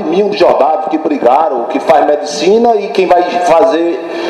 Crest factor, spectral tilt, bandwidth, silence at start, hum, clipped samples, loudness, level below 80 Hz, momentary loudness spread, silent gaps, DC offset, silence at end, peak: 10 dB; -4.5 dB/octave; 12 kHz; 0 s; none; 0.5%; -10 LUFS; -50 dBFS; 5 LU; none; under 0.1%; 0 s; 0 dBFS